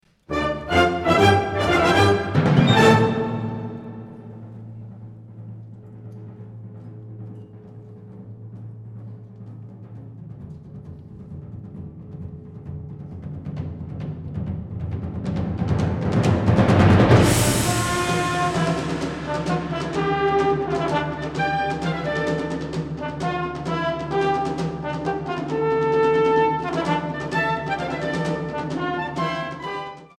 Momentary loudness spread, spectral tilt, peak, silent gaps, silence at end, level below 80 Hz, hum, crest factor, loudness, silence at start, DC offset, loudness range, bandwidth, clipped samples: 23 LU; -6 dB/octave; -2 dBFS; none; 0.15 s; -44 dBFS; none; 22 dB; -21 LUFS; 0.3 s; under 0.1%; 21 LU; 16.5 kHz; under 0.1%